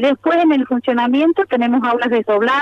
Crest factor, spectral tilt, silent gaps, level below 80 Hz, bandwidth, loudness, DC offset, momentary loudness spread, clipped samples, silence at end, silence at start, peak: 12 dB; -6 dB/octave; none; -62 dBFS; 6.8 kHz; -15 LUFS; under 0.1%; 3 LU; under 0.1%; 0 s; 0 s; -4 dBFS